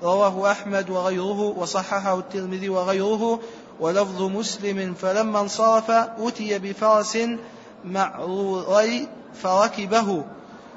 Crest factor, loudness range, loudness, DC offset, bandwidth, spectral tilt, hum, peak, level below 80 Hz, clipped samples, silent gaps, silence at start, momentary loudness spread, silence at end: 18 dB; 2 LU; -23 LUFS; under 0.1%; 8 kHz; -4.5 dB/octave; none; -6 dBFS; -68 dBFS; under 0.1%; none; 0 s; 10 LU; 0 s